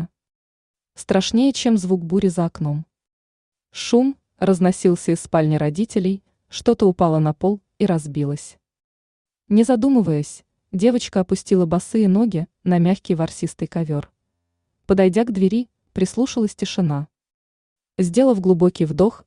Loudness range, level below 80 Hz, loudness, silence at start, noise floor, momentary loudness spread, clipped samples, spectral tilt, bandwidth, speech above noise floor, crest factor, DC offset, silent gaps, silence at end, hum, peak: 2 LU; -52 dBFS; -19 LUFS; 0 s; -75 dBFS; 10 LU; under 0.1%; -6.5 dB/octave; 11 kHz; 57 dB; 16 dB; under 0.1%; 0.35-0.74 s, 3.13-3.52 s, 8.84-9.25 s, 17.34-17.76 s; 0.1 s; none; -4 dBFS